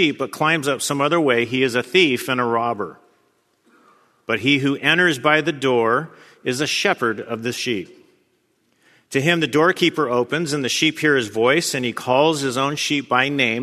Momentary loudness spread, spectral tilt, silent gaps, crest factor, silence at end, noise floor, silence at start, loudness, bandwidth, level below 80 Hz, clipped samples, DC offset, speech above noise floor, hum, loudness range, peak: 9 LU; -4 dB/octave; none; 20 dB; 0 s; -65 dBFS; 0 s; -19 LUFS; 14 kHz; -66 dBFS; under 0.1%; under 0.1%; 46 dB; none; 4 LU; 0 dBFS